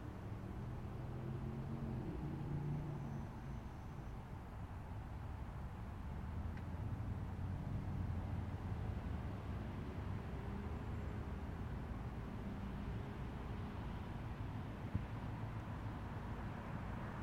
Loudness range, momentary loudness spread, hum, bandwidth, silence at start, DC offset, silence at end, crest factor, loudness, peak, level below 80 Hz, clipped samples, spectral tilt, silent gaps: 3 LU; 5 LU; none; 15.5 kHz; 0 s; under 0.1%; 0 s; 20 dB; -47 LUFS; -26 dBFS; -52 dBFS; under 0.1%; -8.5 dB/octave; none